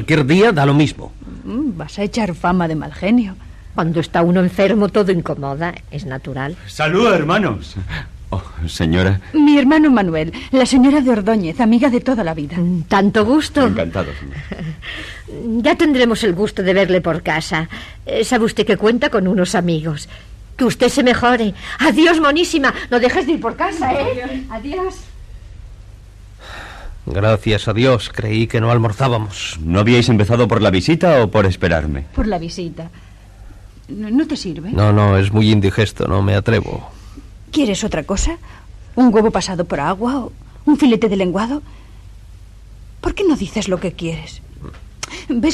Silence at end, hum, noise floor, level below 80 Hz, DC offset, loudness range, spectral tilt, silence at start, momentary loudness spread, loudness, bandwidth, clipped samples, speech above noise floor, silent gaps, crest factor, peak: 0 s; none; -38 dBFS; -34 dBFS; under 0.1%; 6 LU; -6 dB/octave; 0 s; 16 LU; -16 LUFS; 13.5 kHz; under 0.1%; 23 dB; none; 14 dB; -2 dBFS